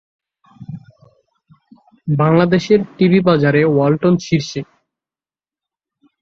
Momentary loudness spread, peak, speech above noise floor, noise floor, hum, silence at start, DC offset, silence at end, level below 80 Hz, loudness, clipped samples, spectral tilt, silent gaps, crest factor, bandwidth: 21 LU; 0 dBFS; over 76 dB; under -90 dBFS; none; 0.6 s; under 0.1%; 1.6 s; -54 dBFS; -14 LUFS; under 0.1%; -7.5 dB/octave; none; 16 dB; 7.2 kHz